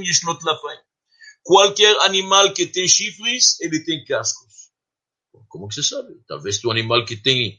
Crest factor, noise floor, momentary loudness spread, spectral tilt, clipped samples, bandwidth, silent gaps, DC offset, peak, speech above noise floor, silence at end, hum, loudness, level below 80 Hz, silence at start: 20 dB; -87 dBFS; 18 LU; -1.5 dB/octave; under 0.1%; 11 kHz; none; under 0.1%; 0 dBFS; 69 dB; 0.05 s; none; -17 LUFS; -64 dBFS; 0 s